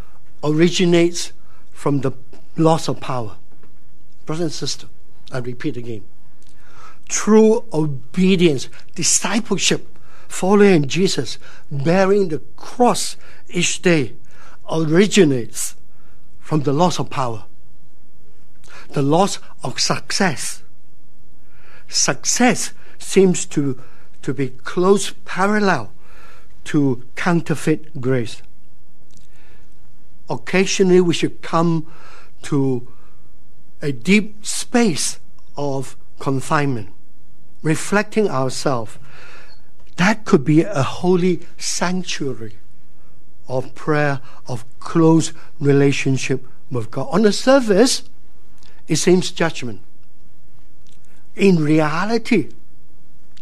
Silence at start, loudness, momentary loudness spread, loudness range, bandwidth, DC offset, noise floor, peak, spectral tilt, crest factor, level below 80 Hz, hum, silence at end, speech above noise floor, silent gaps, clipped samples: 0.45 s; -18 LUFS; 16 LU; 6 LU; 14 kHz; 9%; -54 dBFS; 0 dBFS; -4.5 dB/octave; 20 dB; -52 dBFS; none; 0.9 s; 36 dB; none; under 0.1%